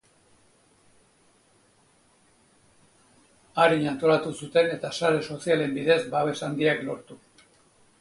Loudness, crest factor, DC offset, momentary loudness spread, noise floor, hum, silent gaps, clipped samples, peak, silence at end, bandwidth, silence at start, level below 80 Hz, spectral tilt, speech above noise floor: -25 LUFS; 20 dB; under 0.1%; 7 LU; -62 dBFS; none; none; under 0.1%; -8 dBFS; 0.85 s; 11.5 kHz; 3.55 s; -68 dBFS; -5 dB/octave; 38 dB